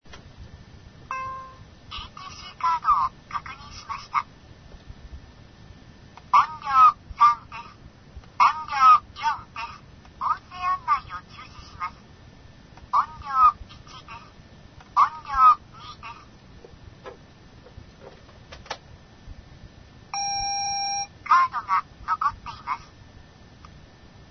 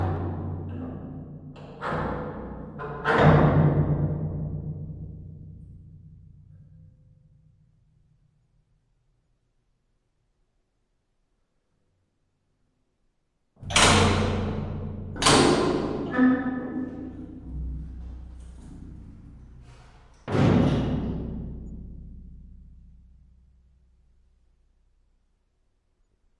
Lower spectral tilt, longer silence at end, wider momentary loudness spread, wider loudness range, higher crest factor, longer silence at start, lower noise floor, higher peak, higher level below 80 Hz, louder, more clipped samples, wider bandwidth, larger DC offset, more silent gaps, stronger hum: second, -2 dB/octave vs -5 dB/octave; second, 1.45 s vs 3.75 s; about the same, 26 LU vs 26 LU; second, 13 LU vs 18 LU; about the same, 20 dB vs 24 dB; about the same, 0.1 s vs 0 s; second, -49 dBFS vs -73 dBFS; about the same, -6 dBFS vs -4 dBFS; second, -50 dBFS vs -42 dBFS; about the same, -22 LUFS vs -24 LUFS; neither; second, 6.4 kHz vs 11.5 kHz; neither; neither; neither